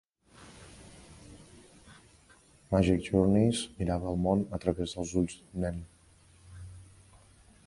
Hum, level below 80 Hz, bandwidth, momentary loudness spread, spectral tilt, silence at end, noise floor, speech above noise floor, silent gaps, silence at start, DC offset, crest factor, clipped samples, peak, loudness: none; -48 dBFS; 11.5 kHz; 26 LU; -6.5 dB/octave; 0.8 s; -60 dBFS; 32 dB; none; 0.4 s; under 0.1%; 22 dB; under 0.1%; -10 dBFS; -30 LUFS